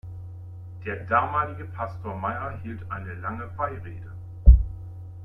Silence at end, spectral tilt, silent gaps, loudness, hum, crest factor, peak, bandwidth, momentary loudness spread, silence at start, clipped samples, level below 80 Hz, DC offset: 0 s; -10 dB/octave; none; -26 LUFS; none; 22 dB; -2 dBFS; 3.4 kHz; 21 LU; 0.05 s; under 0.1%; -26 dBFS; under 0.1%